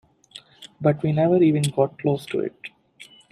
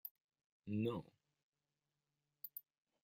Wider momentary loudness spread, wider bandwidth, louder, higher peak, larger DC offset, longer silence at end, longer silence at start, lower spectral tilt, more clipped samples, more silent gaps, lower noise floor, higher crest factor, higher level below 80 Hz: first, 21 LU vs 14 LU; second, 14 kHz vs 16 kHz; first, -22 LUFS vs -47 LUFS; first, -6 dBFS vs -28 dBFS; neither; second, 0.25 s vs 0.45 s; first, 0.35 s vs 0.05 s; second, -7 dB/octave vs -8.5 dB/octave; neither; second, none vs 0.11-0.15 s, 0.21-0.29 s, 0.46-0.60 s, 1.43-1.53 s; second, -49 dBFS vs under -90 dBFS; about the same, 18 dB vs 20 dB; first, -62 dBFS vs -84 dBFS